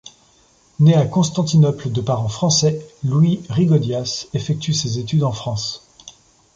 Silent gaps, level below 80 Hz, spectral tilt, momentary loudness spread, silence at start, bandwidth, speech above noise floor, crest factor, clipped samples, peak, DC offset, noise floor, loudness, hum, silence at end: none; -50 dBFS; -6 dB/octave; 9 LU; 0.05 s; 7.8 kHz; 37 dB; 16 dB; under 0.1%; -4 dBFS; under 0.1%; -55 dBFS; -18 LUFS; none; 0.45 s